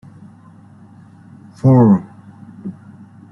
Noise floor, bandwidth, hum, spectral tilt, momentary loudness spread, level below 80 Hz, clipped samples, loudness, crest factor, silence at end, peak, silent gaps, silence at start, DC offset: -43 dBFS; 5.6 kHz; none; -11.5 dB/octave; 22 LU; -52 dBFS; under 0.1%; -13 LUFS; 16 dB; 0.6 s; -2 dBFS; none; 1.65 s; under 0.1%